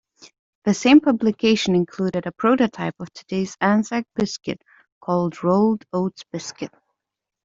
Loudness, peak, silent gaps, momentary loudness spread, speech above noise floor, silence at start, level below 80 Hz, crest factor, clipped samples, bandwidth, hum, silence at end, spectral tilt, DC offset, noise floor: -21 LUFS; -4 dBFS; 4.92-5.01 s; 17 LU; 64 dB; 0.65 s; -60 dBFS; 18 dB; under 0.1%; 7.8 kHz; none; 0.8 s; -5.5 dB/octave; under 0.1%; -84 dBFS